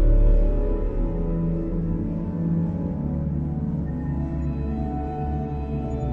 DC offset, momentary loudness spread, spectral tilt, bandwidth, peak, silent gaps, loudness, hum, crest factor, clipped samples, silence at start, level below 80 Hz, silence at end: under 0.1%; 4 LU; -11.5 dB/octave; 2.8 kHz; -10 dBFS; none; -26 LUFS; none; 14 dB; under 0.1%; 0 s; -26 dBFS; 0 s